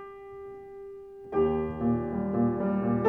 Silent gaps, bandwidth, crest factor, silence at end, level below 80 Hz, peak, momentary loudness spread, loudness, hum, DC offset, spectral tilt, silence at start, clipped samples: none; 3.4 kHz; 18 dB; 0 s; -52 dBFS; -10 dBFS; 17 LU; -28 LUFS; none; under 0.1%; -11 dB/octave; 0 s; under 0.1%